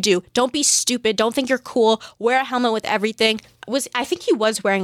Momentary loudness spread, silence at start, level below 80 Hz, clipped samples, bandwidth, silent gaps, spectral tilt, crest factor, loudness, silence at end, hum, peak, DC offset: 7 LU; 0 s; -62 dBFS; under 0.1%; 16.5 kHz; none; -2 dB/octave; 16 dB; -19 LUFS; 0 s; none; -4 dBFS; under 0.1%